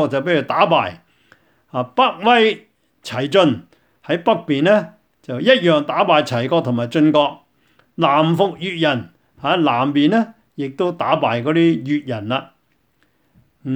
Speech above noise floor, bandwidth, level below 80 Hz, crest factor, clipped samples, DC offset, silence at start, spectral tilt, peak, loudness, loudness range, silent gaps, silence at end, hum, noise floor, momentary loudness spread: 46 dB; 9.4 kHz; -64 dBFS; 18 dB; under 0.1%; under 0.1%; 0 s; -6.5 dB/octave; 0 dBFS; -17 LUFS; 2 LU; none; 0 s; none; -63 dBFS; 13 LU